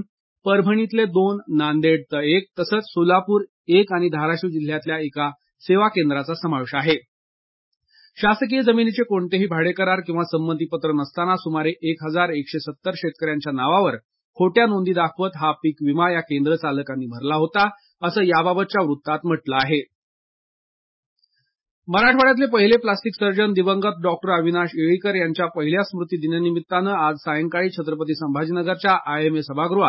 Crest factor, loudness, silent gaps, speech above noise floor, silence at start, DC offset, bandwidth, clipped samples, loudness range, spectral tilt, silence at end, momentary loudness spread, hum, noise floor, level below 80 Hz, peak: 18 dB; -20 LUFS; 0.09-0.36 s, 3.49-3.64 s, 7.08-7.72 s, 14.05-14.09 s, 14.24-14.33 s, 19.95-21.16 s, 21.71-21.82 s; over 70 dB; 0 s; under 0.1%; 5.8 kHz; under 0.1%; 4 LU; -10.5 dB/octave; 0 s; 7 LU; none; under -90 dBFS; -64 dBFS; -2 dBFS